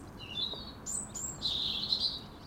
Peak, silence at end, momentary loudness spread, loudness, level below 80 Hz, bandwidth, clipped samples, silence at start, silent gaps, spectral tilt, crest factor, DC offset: -16 dBFS; 0 s; 8 LU; -33 LUFS; -56 dBFS; 16 kHz; under 0.1%; 0 s; none; -1.5 dB/octave; 20 dB; under 0.1%